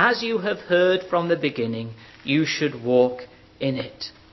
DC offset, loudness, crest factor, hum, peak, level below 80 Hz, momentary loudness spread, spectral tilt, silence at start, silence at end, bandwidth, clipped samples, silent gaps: under 0.1%; -23 LUFS; 18 dB; none; -4 dBFS; -60 dBFS; 14 LU; -5.5 dB/octave; 0 s; 0.2 s; 6.2 kHz; under 0.1%; none